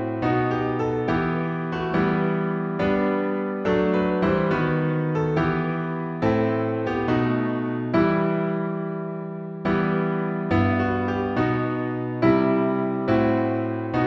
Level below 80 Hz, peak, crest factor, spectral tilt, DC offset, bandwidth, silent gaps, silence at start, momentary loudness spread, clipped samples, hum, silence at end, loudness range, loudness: -48 dBFS; -6 dBFS; 16 dB; -9 dB/octave; under 0.1%; 6.6 kHz; none; 0 s; 6 LU; under 0.1%; none; 0 s; 2 LU; -23 LUFS